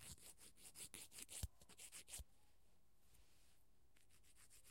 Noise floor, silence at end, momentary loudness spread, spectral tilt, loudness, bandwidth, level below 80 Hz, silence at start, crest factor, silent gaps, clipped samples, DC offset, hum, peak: -79 dBFS; 0 s; 12 LU; -2 dB/octave; -57 LUFS; 16.5 kHz; -68 dBFS; 0 s; 28 dB; none; under 0.1%; under 0.1%; none; -32 dBFS